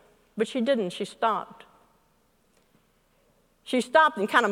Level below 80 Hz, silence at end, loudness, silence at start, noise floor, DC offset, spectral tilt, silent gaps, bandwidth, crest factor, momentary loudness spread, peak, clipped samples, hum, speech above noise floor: -72 dBFS; 0 s; -25 LUFS; 0.35 s; -66 dBFS; under 0.1%; -4 dB/octave; none; 16 kHz; 22 dB; 11 LU; -6 dBFS; under 0.1%; none; 41 dB